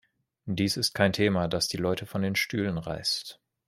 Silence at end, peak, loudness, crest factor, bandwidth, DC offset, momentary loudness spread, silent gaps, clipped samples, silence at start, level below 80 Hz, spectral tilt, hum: 0.35 s; -8 dBFS; -28 LUFS; 20 dB; 15.5 kHz; under 0.1%; 8 LU; none; under 0.1%; 0.45 s; -58 dBFS; -4.5 dB/octave; none